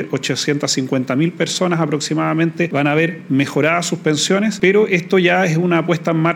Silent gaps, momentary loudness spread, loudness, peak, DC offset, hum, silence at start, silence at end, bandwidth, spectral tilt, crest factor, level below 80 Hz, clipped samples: none; 4 LU; -16 LUFS; 0 dBFS; under 0.1%; none; 0 s; 0 s; 16 kHz; -5 dB/octave; 16 dB; -64 dBFS; under 0.1%